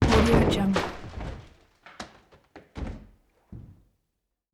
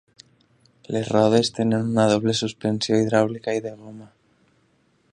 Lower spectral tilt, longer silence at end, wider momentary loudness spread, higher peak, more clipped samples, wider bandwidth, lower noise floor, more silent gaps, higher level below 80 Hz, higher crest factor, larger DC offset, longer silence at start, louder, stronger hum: about the same, -6 dB/octave vs -5.5 dB/octave; second, 0.9 s vs 1.05 s; first, 27 LU vs 11 LU; second, -8 dBFS vs -4 dBFS; neither; first, 15.5 kHz vs 11 kHz; first, -81 dBFS vs -63 dBFS; neither; first, -36 dBFS vs -60 dBFS; about the same, 20 dB vs 20 dB; neither; second, 0 s vs 0.9 s; second, -25 LUFS vs -21 LUFS; neither